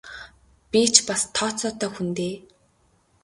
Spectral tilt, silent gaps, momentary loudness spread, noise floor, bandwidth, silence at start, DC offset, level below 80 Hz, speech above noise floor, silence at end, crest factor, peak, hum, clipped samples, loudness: -2 dB/octave; none; 23 LU; -63 dBFS; 11.5 kHz; 0.05 s; under 0.1%; -58 dBFS; 40 dB; 0.85 s; 26 dB; 0 dBFS; none; under 0.1%; -22 LUFS